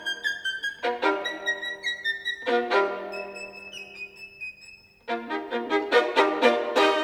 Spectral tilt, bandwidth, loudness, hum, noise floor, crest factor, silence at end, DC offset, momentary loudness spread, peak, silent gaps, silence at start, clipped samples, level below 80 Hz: -2 dB/octave; 15.5 kHz; -26 LUFS; none; -50 dBFS; 20 dB; 0 s; under 0.1%; 16 LU; -6 dBFS; none; 0 s; under 0.1%; -70 dBFS